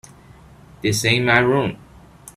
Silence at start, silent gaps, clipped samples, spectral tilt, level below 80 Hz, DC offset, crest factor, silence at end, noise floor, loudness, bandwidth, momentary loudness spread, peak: 0.85 s; none; under 0.1%; -4.5 dB/octave; -48 dBFS; under 0.1%; 22 dB; 0.05 s; -46 dBFS; -18 LUFS; 15.5 kHz; 10 LU; 0 dBFS